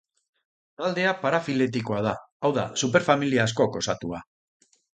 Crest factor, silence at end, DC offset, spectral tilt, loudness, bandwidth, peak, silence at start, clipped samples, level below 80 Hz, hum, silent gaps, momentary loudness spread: 22 dB; 0.75 s; under 0.1%; -4.5 dB/octave; -25 LUFS; 9.4 kHz; -4 dBFS; 0.8 s; under 0.1%; -60 dBFS; none; 2.32-2.40 s; 9 LU